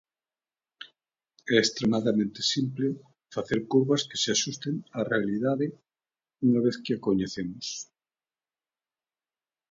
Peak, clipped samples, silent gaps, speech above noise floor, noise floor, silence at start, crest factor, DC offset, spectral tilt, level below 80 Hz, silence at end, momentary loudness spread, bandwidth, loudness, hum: -8 dBFS; under 0.1%; none; over 63 dB; under -90 dBFS; 0.8 s; 22 dB; under 0.1%; -4.5 dB/octave; -66 dBFS; 1.85 s; 15 LU; 7.8 kHz; -27 LUFS; none